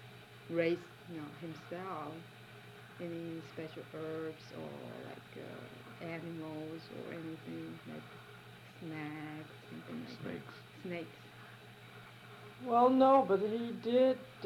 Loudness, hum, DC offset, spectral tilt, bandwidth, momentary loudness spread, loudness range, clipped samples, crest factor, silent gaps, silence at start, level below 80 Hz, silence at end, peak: -37 LUFS; none; under 0.1%; -7 dB/octave; 15.5 kHz; 23 LU; 14 LU; under 0.1%; 22 dB; none; 0 s; -76 dBFS; 0 s; -16 dBFS